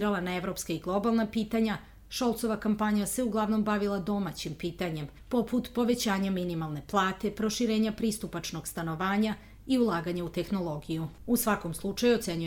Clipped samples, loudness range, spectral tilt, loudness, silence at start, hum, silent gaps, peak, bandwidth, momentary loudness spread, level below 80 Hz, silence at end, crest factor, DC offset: under 0.1%; 1 LU; -5 dB/octave; -30 LUFS; 0 s; none; none; -12 dBFS; 19.5 kHz; 8 LU; -52 dBFS; 0 s; 16 dB; under 0.1%